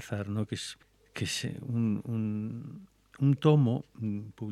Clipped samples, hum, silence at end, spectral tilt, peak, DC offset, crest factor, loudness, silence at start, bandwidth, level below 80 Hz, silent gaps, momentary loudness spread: under 0.1%; none; 0 s; -6.5 dB/octave; -10 dBFS; under 0.1%; 22 dB; -31 LUFS; 0 s; 13 kHz; -68 dBFS; none; 18 LU